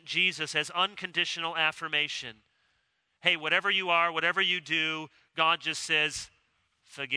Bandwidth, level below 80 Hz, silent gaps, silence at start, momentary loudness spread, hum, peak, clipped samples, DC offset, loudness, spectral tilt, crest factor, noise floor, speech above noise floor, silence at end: 11 kHz; -72 dBFS; none; 0.05 s; 12 LU; none; -8 dBFS; under 0.1%; under 0.1%; -27 LUFS; -1.5 dB/octave; 24 dB; -75 dBFS; 46 dB; 0 s